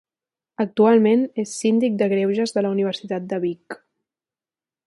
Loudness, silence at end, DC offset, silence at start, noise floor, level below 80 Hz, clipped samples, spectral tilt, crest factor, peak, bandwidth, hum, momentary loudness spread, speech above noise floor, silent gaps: -20 LUFS; 1.1 s; under 0.1%; 0.6 s; under -90 dBFS; -70 dBFS; under 0.1%; -6 dB/octave; 16 dB; -4 dBFS; 11.5 kHz; none; 12 LU; over 70 dB; none